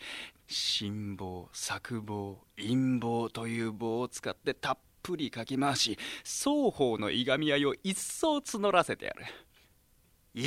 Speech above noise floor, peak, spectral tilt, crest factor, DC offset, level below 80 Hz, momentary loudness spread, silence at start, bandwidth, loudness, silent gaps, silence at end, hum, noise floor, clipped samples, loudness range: 34 dB; -10 dBFS; -4 dB/octave; 22 dB; under 0.1%; -64 dBFS; 12 LU; 0 s; 16 kHz; -32 LUFS; none; 0 s; none; -66 dBFS; under 0.1%; 4 LU